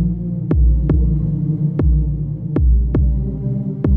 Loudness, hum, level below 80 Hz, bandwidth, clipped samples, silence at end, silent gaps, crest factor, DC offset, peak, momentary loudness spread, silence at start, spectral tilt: -18 LUFS; none; -18 dBFS; 2.3 kHz; under 0.1%; 0 s; none; 12 dB; under 0.1%; -2 dBFS; 6 LU; 0 s; -13 dB/octave